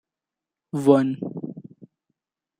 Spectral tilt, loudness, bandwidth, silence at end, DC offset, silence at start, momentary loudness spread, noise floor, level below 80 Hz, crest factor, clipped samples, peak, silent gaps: -8 dB/octave; -22 LUFS; 11.5 kHz; 0.75 s; under 0.1%; 0.75 s; 19 LU; -88 dBFS; -70 dBFS; 22 dB; under 0.1%; -2 dBFS; none